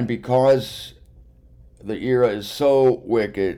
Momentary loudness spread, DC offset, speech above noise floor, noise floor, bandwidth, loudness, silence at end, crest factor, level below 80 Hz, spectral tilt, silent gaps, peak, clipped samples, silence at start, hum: 17 LU; under 0.1%; 29 dB; -49 dBFS; 15.5 kHz; -19 LUFS; 0 s; 12 dB; -50 dBFS; -6.5 dB/octave; none; -8 dBFS; under 0.1%; 0 s; none